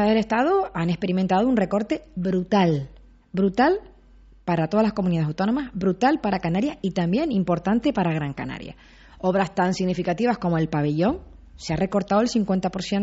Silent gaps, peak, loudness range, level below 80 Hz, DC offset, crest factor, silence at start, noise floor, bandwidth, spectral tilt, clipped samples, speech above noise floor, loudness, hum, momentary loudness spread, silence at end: none; -6 dBFS; 2 LU; -48 dBFS; under 0.1%; 16 dB; 0 s; -50 dBFS; 8 kHz; -6 dB/octave; under 0.1%; 28 dB; -23 LUFS; none; 8 LU; 0 s